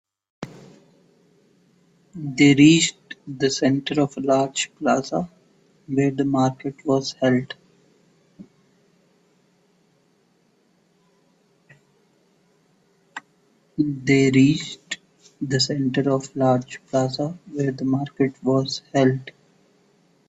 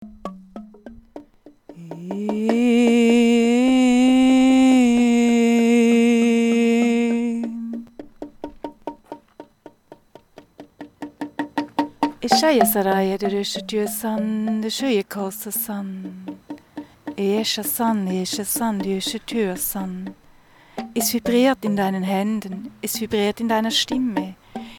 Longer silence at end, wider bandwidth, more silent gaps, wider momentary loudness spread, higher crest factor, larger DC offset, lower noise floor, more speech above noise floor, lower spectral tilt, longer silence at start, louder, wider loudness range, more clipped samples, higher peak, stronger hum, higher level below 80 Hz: first, 1 s vs 0 s; second, 8.4 kHz vs 18 kHz; neither; about the same, 21 LU vs 21 LU; about the same, 20 dB vs 20 dB; neither; first, -63 dBFS vs -51 dBFS; first, 42 dB vs 29 dB; about the same, -5 dB/octave vs -4.5 dB/octave; first, 0.4 s vs 0 s; about the same, -21 LUFS vs -19 LUFS; second, 7 LU vs 14 LU; neither; about the same, -2 dBFS vs -2 dBFS; neither; second, -62 dBFS vs -56 dBFS